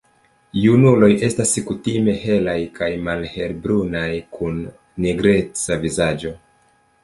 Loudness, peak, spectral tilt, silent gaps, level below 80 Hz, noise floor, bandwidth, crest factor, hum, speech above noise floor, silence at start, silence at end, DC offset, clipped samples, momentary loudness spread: -19 LUFS; -2 dBFS; -5.5 dB/octave; none; -44 dBFS; -58 dBFS; 11.5 kHz; 18 dB; none; 40 dB; 0.55 s; 0.7 s; under 0.1%; under 0.1%; 13 LU